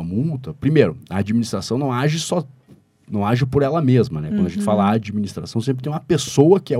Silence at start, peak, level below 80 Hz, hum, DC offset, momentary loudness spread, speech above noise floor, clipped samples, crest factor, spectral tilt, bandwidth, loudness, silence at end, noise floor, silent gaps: 0 s; 0 dBFS; -50 dBFS; none; under 0.1%; 9 LU; 32 dB; under 0.1%; 18 dB; -6.5 dB/octave; 14.5 kHz; -20 LUFS; 0 s; -51 dBFS; none